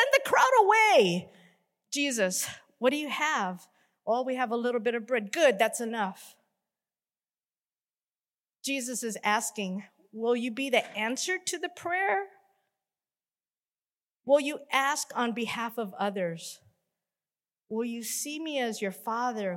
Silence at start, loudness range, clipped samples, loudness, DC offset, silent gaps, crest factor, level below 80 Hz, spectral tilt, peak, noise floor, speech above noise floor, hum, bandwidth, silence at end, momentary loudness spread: 0 s; 7 LU; under 0.1%; -28 LUFS; under 0.1%; 8.40-8.44 s, 13.96-14.08 s; 20 dB; -82 dBFS; -3 dB/octave; -10 dBFS; under -90 dBFS; over 61 dB; none; 16.5 kHz; 0 s; 13 LU